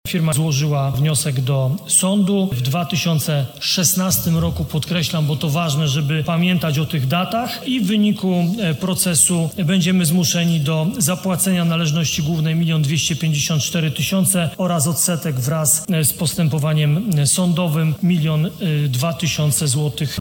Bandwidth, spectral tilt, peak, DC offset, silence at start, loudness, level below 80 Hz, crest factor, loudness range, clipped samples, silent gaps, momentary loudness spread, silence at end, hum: 18 kHz; -4.5 dB/octave; 0 dBFS; under 0.1%; 0.05 s; -18 LUFS; -46 dBFS; 18 dB; 2 LU; under 0.1%; none; 5 LU; 0 s; none